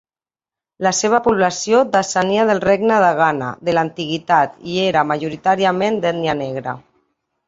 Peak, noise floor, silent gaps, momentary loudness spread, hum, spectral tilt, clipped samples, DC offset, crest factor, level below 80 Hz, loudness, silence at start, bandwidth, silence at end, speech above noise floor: -2 dBFS; under -90 dBFS; none; 8 LU; none; -4 dB/octave; under 0.1%; under 0.1%; 16 dB; -56 dBFS; -17 LUFS; 0.8 s; 8 kHz; 0.7 s; over 73 dB